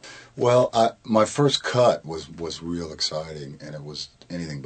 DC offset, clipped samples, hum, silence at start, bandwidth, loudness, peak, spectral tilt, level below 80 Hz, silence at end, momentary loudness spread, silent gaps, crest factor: under 0.1%; under 0.1%; none; 0 s; 9.2 kHz; -23 LUFS; -4 dBFS; -5 dB/octave; -56 dBFS; 0 s; 16 LU; none; 20 dB